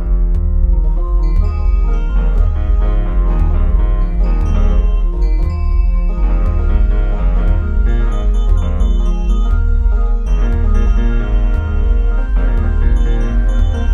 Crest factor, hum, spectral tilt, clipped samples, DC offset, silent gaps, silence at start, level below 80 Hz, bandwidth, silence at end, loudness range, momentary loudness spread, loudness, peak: 10 dB; none; -8.5 dB/octave; under 0.1%; under 0.1%; none; 0 s; -12 dBFS; 3.7 kHz; 0 s; 0 LU; 2 LU; -17 LUFS; -2 dBFS